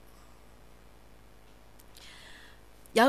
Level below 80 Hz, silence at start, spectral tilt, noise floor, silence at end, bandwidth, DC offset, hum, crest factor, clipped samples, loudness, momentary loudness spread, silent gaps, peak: -60 dBFS; 2.95 s; -3.5 dB/octave; -57 dBFS; 0 s; 15.5 kHz; 0.2%; none; 24 dB; under 0.1%; -41 LUFS; 9 LU; none; -10 dBFS